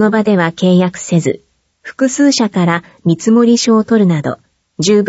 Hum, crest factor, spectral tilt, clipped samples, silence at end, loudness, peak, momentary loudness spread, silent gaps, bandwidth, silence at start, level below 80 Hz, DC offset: none; 12 dB; -5.5 dB/octave; under 0.1%; 0 s; -12 LUFS; 0 dBFS; 9 LU; none; 8 kHz; 0 s; -56 dBFS; under 0.1%